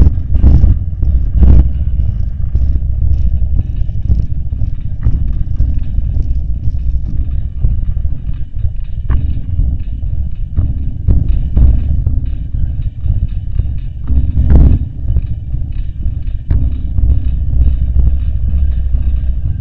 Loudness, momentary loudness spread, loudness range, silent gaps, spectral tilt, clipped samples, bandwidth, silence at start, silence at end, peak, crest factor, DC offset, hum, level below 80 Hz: -16 LUFS; 10 LU; 4 LU; none; -11.5 dB/octave; 0.9%; 3 kHz; 0 s; 0 s; 0 dBFS; 12 dB; 10%; none; -14 dBFS